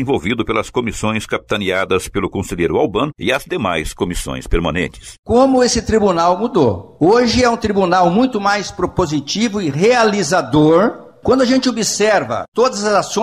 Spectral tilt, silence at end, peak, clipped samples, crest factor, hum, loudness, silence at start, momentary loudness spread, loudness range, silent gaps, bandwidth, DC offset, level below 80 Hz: -4.5 dB/octave; 0 s; -2 dBFS; under 0.1%; 12 dB; none; -16 LUFS; 0 s; 9 LU; 4 LU; 5.19-5.23 s, 12.48-12.52 s; 15 kHz; under 0.1%; -34 dBFS